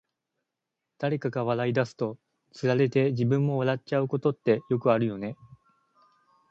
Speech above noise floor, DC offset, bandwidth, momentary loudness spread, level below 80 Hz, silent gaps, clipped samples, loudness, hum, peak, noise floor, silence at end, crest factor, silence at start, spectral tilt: 59 dB; under 0.1%; 7.8 kHz; 9 LU; -68 dBFS; none; under 0.1%; -27 LUFS; none; -10 dBFS; -85 dBFS; 1.05 s; 18 dB; 1 s; -8 dB/octave